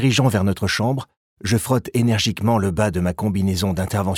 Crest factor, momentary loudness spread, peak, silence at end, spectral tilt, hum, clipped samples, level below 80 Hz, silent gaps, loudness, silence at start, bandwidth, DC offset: 14 dB; 4 LU; -4 dBFS; 0 s; -5.5 dB/octave; none; under 0.1%; -44 dBFS; 1.17-1.37 s; -20 LUFS; 0 s; 17 kHz; under 0.1%